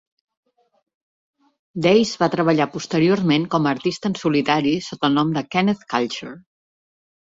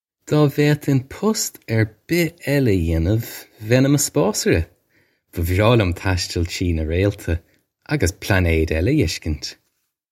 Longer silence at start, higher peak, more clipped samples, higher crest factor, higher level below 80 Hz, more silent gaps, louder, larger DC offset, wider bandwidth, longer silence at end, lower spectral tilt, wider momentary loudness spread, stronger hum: first, 1.75 s vs 0.3 s; second, -4 dBFS vs 0 dBFS; neither; about the same, 18 dB vs 18 dB; second, -60 dBFS vs -34 dBFS; neither; about the same, -20 LUFS vs -20 LUFS; neither; second, 7.8 kHz vs 16.5 kHz; first, 0.9 s vs 0.6 s; about the same, -6 dB/octave vs -5.5 dB/octave; second, 6 LU vs 10 LU; neither